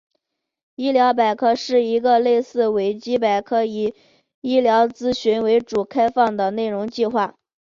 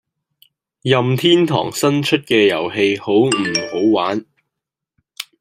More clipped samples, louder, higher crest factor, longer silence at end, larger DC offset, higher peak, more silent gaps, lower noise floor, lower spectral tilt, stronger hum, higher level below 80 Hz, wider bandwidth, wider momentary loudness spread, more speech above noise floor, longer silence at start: neither; second, -19 LUFS vs -16 LUFS; about the same, 16 dB vs 16 dB; first, 0.45 s vs 0.2 s; neither; second, -4 dBFS vs 0 dBFS; first, 4.34-4.42 s vs none; second, -75 dBFS vs -82 dBFS; about the same, -5.5 dB/octave vs -5 dB/octave; neither; about the same, -60 dBFS vs -60 dBFS; second, 7.4 kHz vs 16 kHz; about the same, 7 LU vs 9 LU; second, 57 dB vs 67 dB; about the same, 0.8 s vs 0.85 s